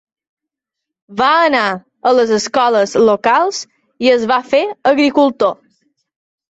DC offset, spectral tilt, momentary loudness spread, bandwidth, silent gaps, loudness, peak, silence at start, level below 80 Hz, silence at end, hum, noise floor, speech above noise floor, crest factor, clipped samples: under 0.1%; -3.5 dB/octave; 8 LU; 8.2 kHz; none; -13 LUFS; -2 dBFS; 1.1 s; -58 dBFS; 1.05 s; none; -81 dBFS; 68 dB; 14 dB; under 0.1%